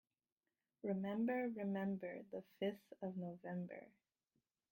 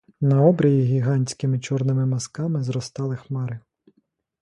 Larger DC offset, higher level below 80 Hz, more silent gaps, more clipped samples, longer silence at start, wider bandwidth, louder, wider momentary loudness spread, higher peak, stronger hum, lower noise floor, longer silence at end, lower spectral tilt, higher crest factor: neither; second, -88 dBFS vs -60 dBFS; neither; neither; first, 0.85 s vs 0.2 s; first, 16.5 kHz vs 11 kHz; second, -45 LUFS vs -22 LUFS; about the same, 11 LU vs 12 LU; second, -30 dBFS vs -4 dBFS; neither; first, under -90 dBFS vs -69 dBFS; about the same, 0.85 s vs 0.8 s; first, -9 dB/octave vs -7.5 dB/octave; about the same, 16 dB vs 18 dB